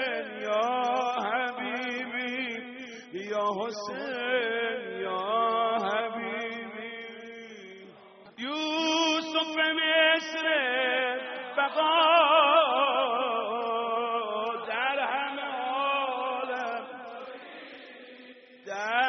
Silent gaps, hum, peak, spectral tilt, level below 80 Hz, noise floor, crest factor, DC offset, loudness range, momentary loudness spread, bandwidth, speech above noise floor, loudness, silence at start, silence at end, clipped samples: none; none; -10 dBFS; 1 dB/octave; -84 dBFS; -52 dBFS; 20 dB; under 0.1%; 8 LU; 19 LU; 6.4 kHz; 26 dB; -27 LUFS; 0 s; 0 s; under 0.1%